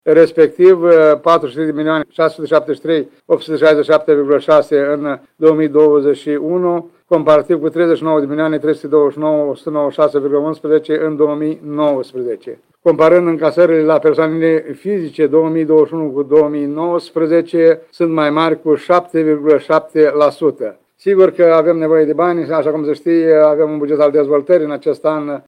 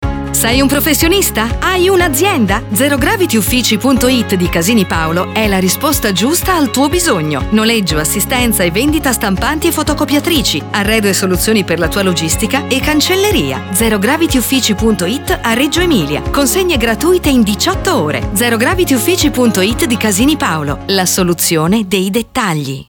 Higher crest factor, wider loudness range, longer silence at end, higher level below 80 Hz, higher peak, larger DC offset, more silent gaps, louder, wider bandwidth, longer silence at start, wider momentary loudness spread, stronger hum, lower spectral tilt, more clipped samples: about the same, 12 dB vs 10 dB; about the same, 3 LU vs 1 LU; about the same, 0.05 s vs 0.05 s; second, -62 dBFS vs -26 dBFS; about the same, 0 dBFS vs -2 dBFS; neither; neither; about the same, -13 LUFS vs -12 LUFS; second, 9.6 kHz vs 19.5 kHz; about the same, 0.05 s vs 0 s; first, 8 LU vs 4 LU; neither; first, -7.5 dB/octave vs -4 dB/octave; neither